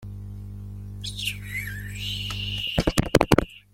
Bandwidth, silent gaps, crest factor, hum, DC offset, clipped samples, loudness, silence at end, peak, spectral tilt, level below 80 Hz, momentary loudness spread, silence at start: 16.5 kHz; none; 26 dB; 50 Hz at -35 dBFS; under 0.1%; under 0.1%; -26 LUFS; 0.15 s; 0 dBFS; -5 dB/octave; -38 dBFS; 17 LU; 0 s